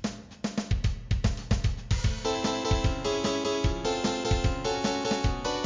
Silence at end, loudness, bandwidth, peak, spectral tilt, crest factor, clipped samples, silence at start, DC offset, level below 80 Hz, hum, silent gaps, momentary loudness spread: 0 s; -29 LUFS; 7.6 kHz; -12 dBFS; -5 dB/octave; 16 dB; under 0.1%; 0 s; under 0.1%; -34 dBFS; none; none; 3 LU